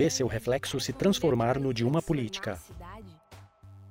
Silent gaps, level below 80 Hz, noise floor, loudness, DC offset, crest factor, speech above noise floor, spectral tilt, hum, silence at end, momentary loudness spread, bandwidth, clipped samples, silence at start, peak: none; -52 dBFS; -53 dBFS; -29 LUFS; under 0.1%; 16 dB; 25 dB; -5 dB/octave; none; 0 s; 19 LU; 16 kHz; under 0.1%; 0 s; -14 dBFS